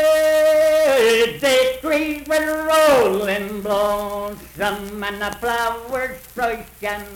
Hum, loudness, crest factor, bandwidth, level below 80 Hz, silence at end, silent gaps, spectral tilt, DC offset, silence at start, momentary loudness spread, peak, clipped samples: none; -19 LUFS; 12 dB; 18.5 kHz; -46 dBFS; 0 s; none; -3 dB/octave; under 0.1%; 0 s; 12 LU; -6 dBFS; under 0.1%